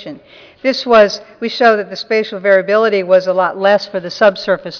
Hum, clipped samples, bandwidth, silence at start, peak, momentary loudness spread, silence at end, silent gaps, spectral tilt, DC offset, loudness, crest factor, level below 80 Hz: none; under 0.1%; 5.4 kHz; 0 s; 0 dBFS; 9 LU; 0 s; none; -4.5 dB/octave; under 0.1%; -13 LUFS; 12 dB; -56 dBFS